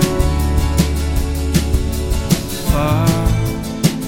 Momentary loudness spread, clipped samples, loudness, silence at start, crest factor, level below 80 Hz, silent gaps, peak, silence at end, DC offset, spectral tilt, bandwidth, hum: 5 LU; under 0.1%; -17 LUFS; 0 s; 16 dB; -20 dBFS; none; 0 dBFS; 0 s; under 0.1%; -5.5 dB/octave; 17 kHz; none